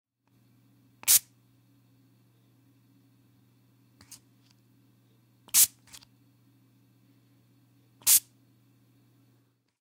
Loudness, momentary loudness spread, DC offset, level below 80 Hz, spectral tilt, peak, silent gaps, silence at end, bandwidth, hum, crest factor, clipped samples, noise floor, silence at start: -22 LUFS; 6 LU; under 0.1%; -76 dBFS; 2.5 dB/octave; -6 dBFS; none; 1.6 s; 16 kHz; none; 28 dB; under 0.1%; -68 dBFS; 1.05 s